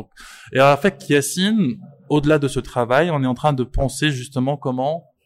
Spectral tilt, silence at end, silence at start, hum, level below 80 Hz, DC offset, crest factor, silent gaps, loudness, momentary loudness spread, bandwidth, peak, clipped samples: -5.5 dB/octave; 0.25 s; 0 s; none; -36 dBFS; under 0.1%; 16 dB; none; -19 LUFS; 8 LU; 15.5 kHz; -2 dBFS; under 0.1%